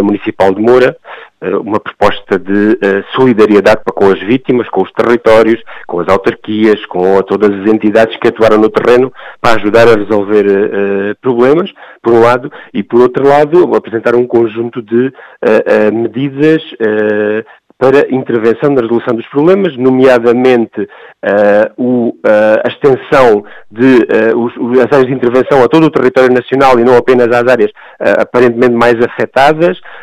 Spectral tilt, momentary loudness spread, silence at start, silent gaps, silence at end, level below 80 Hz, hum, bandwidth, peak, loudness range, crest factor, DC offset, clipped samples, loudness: -7 dB/octave; 8 LU; 0 s; none; 0 s; -44 dBFS; none; 11 kHz; 0 dBFS; 3 LU; 8 dB; under 0.1%; 1%; -9 LUFS